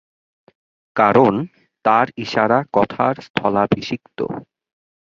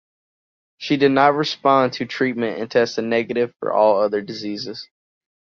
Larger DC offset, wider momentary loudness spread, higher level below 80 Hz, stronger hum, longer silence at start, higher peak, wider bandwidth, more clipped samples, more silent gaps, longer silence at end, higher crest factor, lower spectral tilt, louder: neither; about the same, 12 LU vs 12 LU; first, -54 dBFS vs -66 dBFS; neither; first, 0.95 s vs 0.8 s; about the same, -2 dBFS vs -2 dBFS; about the same, 7.4 kHz vs 7.2 kHz; neither; first, 3.30-3.34 s vs none; about the same, 0.7 s vs 0.65 s; about the same, 18 dB vs 18 dB; first, -7 dB/octave vs -5.5 dB/octave; about the same, -18 LUFS vs -19 LUFS